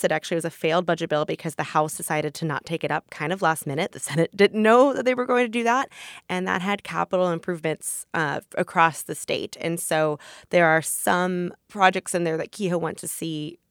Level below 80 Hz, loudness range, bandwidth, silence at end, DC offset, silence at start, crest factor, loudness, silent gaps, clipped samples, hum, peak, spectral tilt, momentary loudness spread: -70 dBFS; 4 LU; 20 kHz; 0.15 s; under 0.1%; 0 s; 22 dB; -24 LUFS; none; under 0.1%; none; -2 dBFS; -4.5 dB/octave; 10 LU